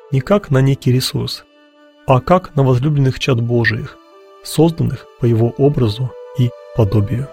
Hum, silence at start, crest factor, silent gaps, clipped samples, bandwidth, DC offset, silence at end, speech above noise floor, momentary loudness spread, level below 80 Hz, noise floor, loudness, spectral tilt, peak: none; 0.1 s; 16 dB; none; under 0.1%; 16.5 kHz; under 0.1%; 0 s; 33 dB; 10 LU; -40 dBFS; -48 dBFS; -16 LUFS; -7 dB/octave; 0 dBFS